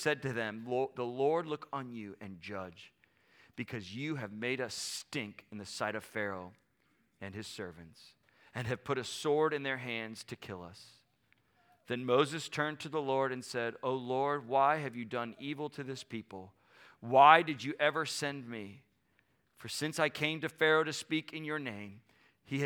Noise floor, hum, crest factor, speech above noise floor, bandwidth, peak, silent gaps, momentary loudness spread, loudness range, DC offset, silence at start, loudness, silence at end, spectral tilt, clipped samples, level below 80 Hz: -74 dBFS; none; 28 dB; 40 dB; 18 kHz; -6 dBFS; none; 17 LU; 11 LU; under 0.1%; 0 s; -34 LUFS; 0 s; -4.5 dB/octave; under 0.1%; -78 dBFS